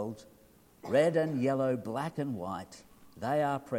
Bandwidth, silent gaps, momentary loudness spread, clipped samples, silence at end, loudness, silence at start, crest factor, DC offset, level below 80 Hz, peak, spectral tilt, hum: 16.5 kHz; none; 16 LU; under 0.1%; 0 s; -32 LUFS; 0 s; 18 dB; under 0.1%; -68 dBFS; -14 dBFS; -7 dB/octave; none